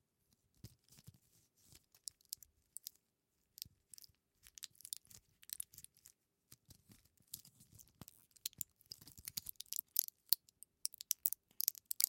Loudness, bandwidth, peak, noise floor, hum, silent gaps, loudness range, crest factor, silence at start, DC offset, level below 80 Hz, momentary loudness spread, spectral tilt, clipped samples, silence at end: -43 LUFS; 17 kHz; -6 dBFS; -85 dBFS; none; none; 15 LU; 42 dB; 0.65 s; under 0.1%; -80 dBFS; 26 LU; 1 dB/octave; under 0.1%; 0 s